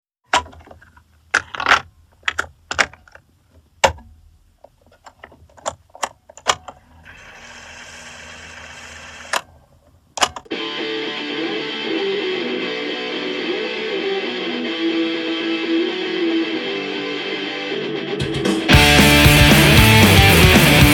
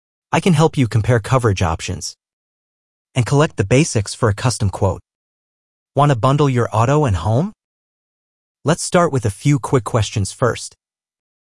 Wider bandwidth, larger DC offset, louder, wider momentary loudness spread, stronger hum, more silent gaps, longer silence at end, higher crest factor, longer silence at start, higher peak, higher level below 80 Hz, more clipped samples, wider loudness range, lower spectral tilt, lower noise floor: first, 19 kHz vs 12 kHz; second, under 0.1% vs 0.2%; about the same, -16 LUFS vs -17 LUFS; first, 25 LU vs 10 LU; neither; second, none vs 2.33-3.05 s, 5.15-5.86 s, 7.64-8.55 s; second, 0 s vs 0.8 s; about the same, 18 dB vs 16 dB; about the same, 0.35 s vs 0.3 s; about the same, 0 dBFS vs 0 dBFS; first, -30 dBFS vs -44 dBFS; neither; first, 16 LU vs 1 LU; second, -4 dB/octave vs -6 dB/octave; second, -54 dBFS vs under -90 dBFS